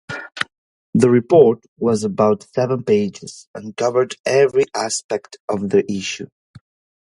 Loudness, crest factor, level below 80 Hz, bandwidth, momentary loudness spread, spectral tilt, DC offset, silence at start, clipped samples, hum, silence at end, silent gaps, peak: -18 LUFS; 18 dB; -58 dBFS; 11.5 kHz; 17 LU; -5.5 dB/octave; under 0.1%; 0.1 s; under 0.1%; none; 0.45 s; 0.58-0.93 s, 1.68-1.76 s, 3.47-3.54 s, 4.20-4.24 s, 5.04-5.09 s, 5.40-5.48 s, 6.32-6.54 s; 0 dBFS